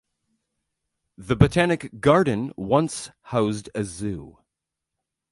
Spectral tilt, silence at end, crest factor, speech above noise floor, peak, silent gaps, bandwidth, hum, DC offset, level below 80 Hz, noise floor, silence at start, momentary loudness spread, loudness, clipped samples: -6 dB/octave; 1 s; 24 dB; 62 dB; 0 dBFS; none; 11.5 kHz; none; under 0.1%; -44 dBFS; -84 dBFS; 1.2 s; 13 LU; -23 LUFS; under 0.1%